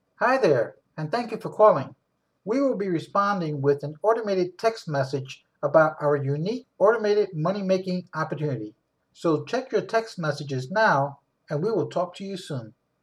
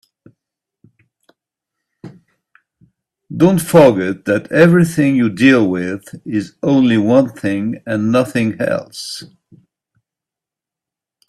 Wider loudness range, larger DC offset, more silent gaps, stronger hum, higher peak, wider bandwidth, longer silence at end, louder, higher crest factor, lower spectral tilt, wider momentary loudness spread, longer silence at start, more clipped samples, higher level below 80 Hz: second, 3 LU vs 8 LU; neither; neither; neither; second, -6 dBFS vs 0 dBFS; second, 11.5 kHz vs 14 kHz; second, 0.3 s vs 2.05 s; second, -25 LUFS vs -14 LUFS; about the same, 18 dB vs 16 dB; about the same, -6.5 dB/octave vs -6.5 dB/octave; about the same, 13 LU vs 14 LU; second, 0.2 s vs 2.05 s; neither; second, -74 dBFS vs -54 dBFS